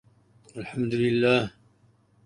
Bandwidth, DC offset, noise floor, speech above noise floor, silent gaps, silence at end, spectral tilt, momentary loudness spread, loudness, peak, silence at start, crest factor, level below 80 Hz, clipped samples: 10.5 kHz; under 0.1%; -62 dBFS; 38 dB; none; 0.75 s; -6.5 dB/octave; 17 LU; -25 LUFS; -8 dBFS; 0.55 s; 20 dB; -60 dBFS; under 0.1%